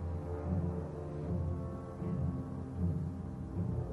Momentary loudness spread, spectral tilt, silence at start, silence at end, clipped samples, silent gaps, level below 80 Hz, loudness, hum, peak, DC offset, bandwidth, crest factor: 5 LU; -10.5 dB/octave; 0 s; 0 s; under 0.1%; none; -48 dBFS; -39 LUFS; none; -22 dBFS; under 0.1%; 5.8 kHz; 14 dB